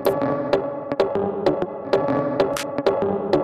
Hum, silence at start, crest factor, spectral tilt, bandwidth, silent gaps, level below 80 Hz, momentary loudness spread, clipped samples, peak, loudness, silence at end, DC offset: none; 0 s; 18 dB; -6 dB/octave; 14 kHz; none; -52 dBFS; 2 LU; under 0.1%; -4 dBFS; -22 LUFS; 0 s; under 0.1%